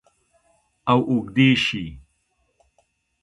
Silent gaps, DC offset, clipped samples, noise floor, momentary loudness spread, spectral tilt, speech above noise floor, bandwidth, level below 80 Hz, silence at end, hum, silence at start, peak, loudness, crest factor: none; under 0.1%; under 0.1%; -69 dBFS; 14 LU; -6 dB/octave; 50 dB; 11.5 kHz; -52 dBFS; 1.25 s; none; 0.85 s; -4 dBFS; -20 LUFS; 20 dB